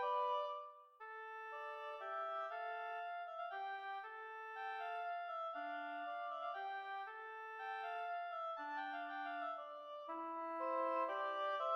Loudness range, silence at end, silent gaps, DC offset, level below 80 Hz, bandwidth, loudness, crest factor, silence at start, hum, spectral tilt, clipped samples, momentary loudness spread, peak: 3 LU; 0 s; none; under 0.1%; under -90 dBFS; 7 kHz; -45 LUFS; 16 dB; 0 s; none; -2 dB/octave; under 0.1%; 9 LU; -28 dBFS